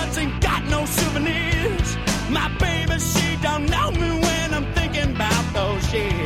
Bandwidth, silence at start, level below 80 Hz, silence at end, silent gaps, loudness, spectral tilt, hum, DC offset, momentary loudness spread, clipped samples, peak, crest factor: 16.5 kHz; 0 s; -28 dBFS; 0 s; none; -21 LUFS; -4.5 dB/octave; none; under 0.1%; 2 LU; under 0.1%; -6 dBFS; 16 dB